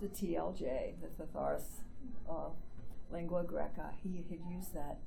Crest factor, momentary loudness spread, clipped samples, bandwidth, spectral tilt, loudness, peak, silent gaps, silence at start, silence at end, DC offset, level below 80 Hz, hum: 14 dB; 13 LU; under 0.1%; 18.5 kHz; -6.5 dB/octave; -43 LUFS; -24 dBFS; none; 0 s; 0 s; under 0.1%; -50 dBFS; none